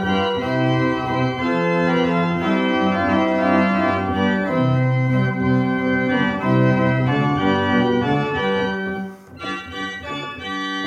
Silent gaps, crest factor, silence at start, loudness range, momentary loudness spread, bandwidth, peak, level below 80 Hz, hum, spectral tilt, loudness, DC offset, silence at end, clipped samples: none; 14 dB; 0 s; 2 LU; 10 LU; 8.2 kHz; -4 dBFS; -52 dBFS; none; -7.5 dB/octave; -19 LUFS; under 0.1%; 0 s; under 0.1%